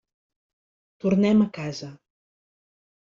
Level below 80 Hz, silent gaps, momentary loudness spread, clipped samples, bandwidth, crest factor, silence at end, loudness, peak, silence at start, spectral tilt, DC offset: -62 dBFS; none; 17 LU; under 0.1%; 7.4 kHz; 18 dB; 1.05 s; -23 LUFS; -10 dBFS; 1.05 s; -7.5 dB/octave; under 0.1%